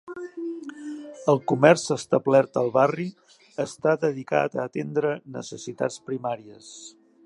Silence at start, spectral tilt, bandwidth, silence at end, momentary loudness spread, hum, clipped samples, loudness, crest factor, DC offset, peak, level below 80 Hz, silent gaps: 0.05 s; -5.5 dB/octave; 11.5 kHz; 0.35 s; 18 LU; none; under 0.1%; -24 LUFS; 24 dB; under 0.1%; -2 dBFS; -72 dBFS; none